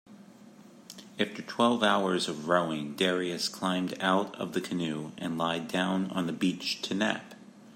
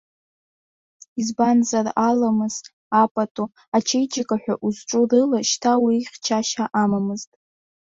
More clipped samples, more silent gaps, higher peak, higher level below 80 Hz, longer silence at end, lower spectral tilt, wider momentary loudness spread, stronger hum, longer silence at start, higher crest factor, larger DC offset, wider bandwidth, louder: neither; second, none vs 2.73-2.91 s, 3.11-3.15 s, 3.31-3.35 s, 3.68-3.72 s; second, -10 dBFS vs -6 dBFS; second, -76 dBFS vs -66 dBFS; second, 0 s vs 0.7 s; about the same, -4.5 dB/octave vs -4 dB/octave; about the same, 9 LU vs 10 LU; neither; second, 0.1 s vs 1.15 s; about the same, 20 dB vs 16 dB; neither; first, 16 kHz vs 7.8 kHz; second, -30 LUFS vs -21 LUFS